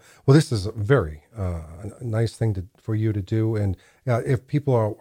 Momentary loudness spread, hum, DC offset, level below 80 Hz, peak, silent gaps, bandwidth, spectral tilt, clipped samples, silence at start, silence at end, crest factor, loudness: 13 LU; none; under 0.1%; -46 dBFS; -4 dBFS; none; 12 kHz; -7.5 dB/octave; under 0.1%; 0.25 s; 0.05 s; 18 dB; -24 LUFS